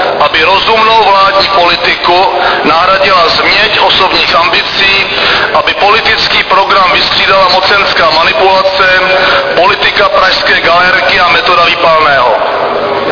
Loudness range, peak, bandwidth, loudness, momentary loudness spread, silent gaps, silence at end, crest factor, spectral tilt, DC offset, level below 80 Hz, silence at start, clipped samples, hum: 0 LU; 0 dBFS; 5.4 kHz; -6 LUFS; 2 LU; none; 0 s; 6 dB; -3.5 dB/octave; 0.4%; -36 dBFS; 0 s; 2%; none